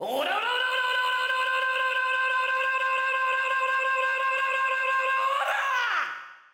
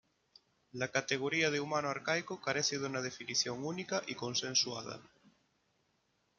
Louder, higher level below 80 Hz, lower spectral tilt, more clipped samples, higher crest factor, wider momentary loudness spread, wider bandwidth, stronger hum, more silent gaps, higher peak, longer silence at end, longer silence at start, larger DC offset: first, -25 LUFS vs -35 LUFS; about the same, -80 dBFS vs -78 dBFS; second, 0 dB/octave vs -2.5 dB/octave; neither; second, 10 dB vs 20 dB; second, 1 LU vs 9 LU; first, 16.5 kHz vs 11 kHz; neither; neither; about the same, -16 dBFS vs -16 dBFS; second, 0.2 s vs 1.35 s; second, 0 s vs 0.75 s; neither